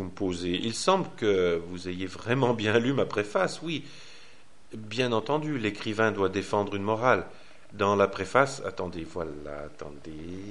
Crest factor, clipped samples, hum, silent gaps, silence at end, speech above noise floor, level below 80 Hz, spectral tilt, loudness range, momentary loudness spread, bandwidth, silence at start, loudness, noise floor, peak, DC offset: 22 dB; under 0.1%; none; none; 0 s; 29 dB; -58 dBFS; -5 dB/octave; 3 LU; 16 LU; 11.5 kHz; 0 s; -28 LUFS; -57 dBFS; -6 dBFS; 0.6%